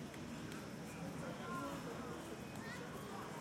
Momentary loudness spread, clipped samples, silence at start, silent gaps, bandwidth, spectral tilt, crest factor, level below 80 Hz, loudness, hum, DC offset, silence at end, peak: 4 LU; under 0.1%; 0 s; none; 16.5 kHz; -5 dB/octave; 16 dB; -68 dBFS; -48 LUFS; none; under 0.1%; 0 s; -32 dBFS